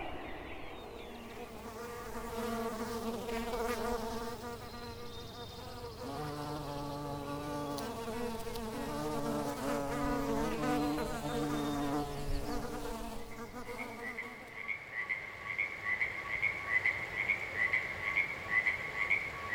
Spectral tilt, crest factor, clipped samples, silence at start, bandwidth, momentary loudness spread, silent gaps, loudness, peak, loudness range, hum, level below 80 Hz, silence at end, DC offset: -4.5 dB/octave; 20 dB; under 0.1%; 0 s; over 20 kHz; 14 LU; none; -37 LUFS; -18 dBFS; 9 LU; none; -50 dBFS; 0 s; under 0.1%